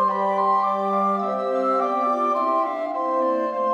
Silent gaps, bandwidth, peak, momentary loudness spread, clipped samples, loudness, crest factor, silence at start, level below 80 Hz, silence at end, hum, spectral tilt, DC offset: none; 8.8 kHz; -10 dBFS; 4 LU; under 0.1%; -22 LUFS; 12 dB; 0 s; -70 dBFS; 0 s; none; -7 dB/octave; under 0.1%